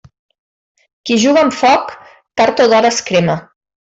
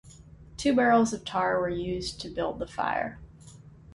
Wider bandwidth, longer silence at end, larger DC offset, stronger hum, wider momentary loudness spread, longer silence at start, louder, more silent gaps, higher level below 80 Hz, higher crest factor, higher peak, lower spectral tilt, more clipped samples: second, 8.2 kHz vs 11.5 kHz; first, 0.45 s vs 0.25 s; neither; neither; about the same, 13 LU vs 12 LU; first, 1.05 s vs 0.05 s; first, -13 LUFS vs -28 LUFS; neither; about the same, -54 dBFS vs -52 dBFS; second, 12 dB vs 18 dB; first, -2 dBFS vs -12 dBFS; about the same, -4 dB/octave vs -5 dB/octave; neither